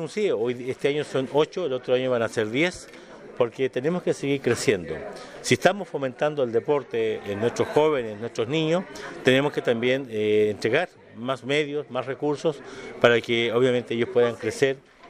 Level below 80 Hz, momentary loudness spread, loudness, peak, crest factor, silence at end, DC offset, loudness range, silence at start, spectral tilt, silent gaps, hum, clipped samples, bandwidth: -62 dBFS; 9 LU; -24 LUFS; -2 dBFS; 22 dB; 0 s; under 0.1%; 2 LU; 0 s; -5 dB/octave; none; none; under 0.1%; 14.5 kHz